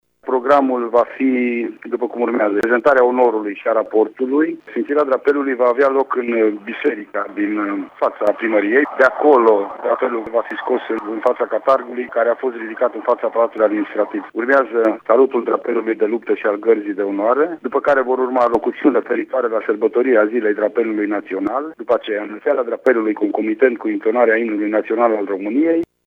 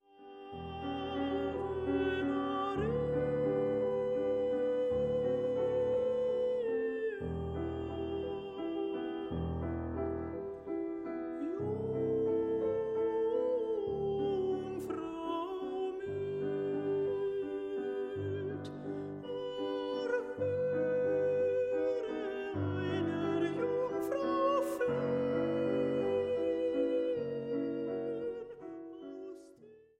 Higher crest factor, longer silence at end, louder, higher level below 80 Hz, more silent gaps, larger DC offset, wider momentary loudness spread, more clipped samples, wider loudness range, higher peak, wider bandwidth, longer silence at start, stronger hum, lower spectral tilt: about the same, 16 dB vs 14 dB; about the same, 0.25 s vs 0.2 s; first, -17 LUFS vs -35 LUFS; second, -64 dBFS vs -58 dBFS; neither; neither; about the same, 7 LU vs 8 LU; neither; second, 2 LU vs 5 LU; first, 0 dBFS vs -20 dBFS; second, 7 kHz vs 13 kHz; about the same, 0.25 s vs 0.2 s; neither; about the same, -7 dB/octave vs -7.5 dB/octave